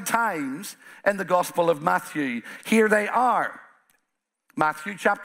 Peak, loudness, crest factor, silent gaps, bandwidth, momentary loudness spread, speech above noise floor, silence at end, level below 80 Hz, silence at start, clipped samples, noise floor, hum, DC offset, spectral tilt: -4 dBFS; -24 LUFS; 22 dB; none; 16 kHz; 12 LU; 55 dB; 0 s; -72 dBFS; 0 s; under 0.1%; -79 dBFS; none; under 0.1%; -4.5 dB/octave